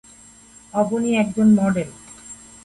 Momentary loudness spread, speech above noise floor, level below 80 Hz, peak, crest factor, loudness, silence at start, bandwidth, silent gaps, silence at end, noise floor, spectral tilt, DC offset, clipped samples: 22 LU; 29 dB; -56 dBFS; -6 dBFS; 14 dB; -19 LUFS; 0.75 s; 11.5 kHz; none; 0.3 s; -47 dBFS; -6.5 dB/octave; under 0.1%; under 0.1%